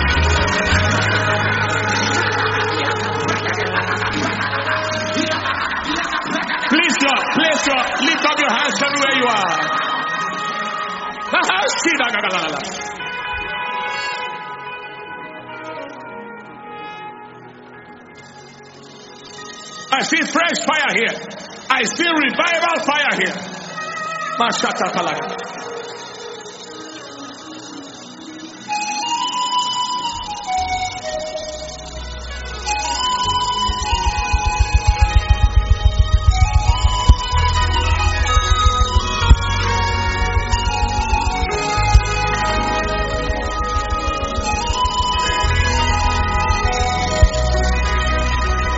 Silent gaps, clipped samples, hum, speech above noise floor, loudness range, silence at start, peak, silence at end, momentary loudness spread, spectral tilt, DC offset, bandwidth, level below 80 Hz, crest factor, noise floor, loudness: none; under 0.1%; none; 21 dB; 11 LU; 0 s; 0 dBFS; 0 s; 16 LU; -4 dB/octave; under 0.1%; 8 kHz; -24 dBFS; 18 dB; -39 dBFS; -18 LUFS